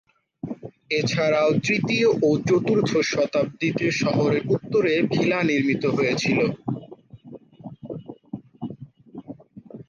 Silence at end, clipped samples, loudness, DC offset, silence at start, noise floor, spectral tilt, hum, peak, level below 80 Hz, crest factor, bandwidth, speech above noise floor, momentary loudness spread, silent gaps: 0.05 s; under 0.1%; -22 LUFS; under 0.1%; 0.45 s; -44 dBFS; -5.5 dB/octave; none; -8 dBFS; -60 dBFS; 14 dB; 7.4 kHz; 23 dB; 21 LU; none